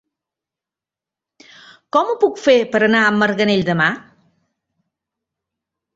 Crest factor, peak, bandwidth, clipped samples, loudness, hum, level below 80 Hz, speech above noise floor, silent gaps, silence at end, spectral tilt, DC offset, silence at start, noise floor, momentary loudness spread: 18 dB; -2 dBFS; 8 kHz; under 0.1%; -16 LUFS; none; -58 dBFS; 73 dB; none; 1.95 s; -5.5 dB/octave; under 0.1%; 1.95 s; -88 dBFS; 5 LU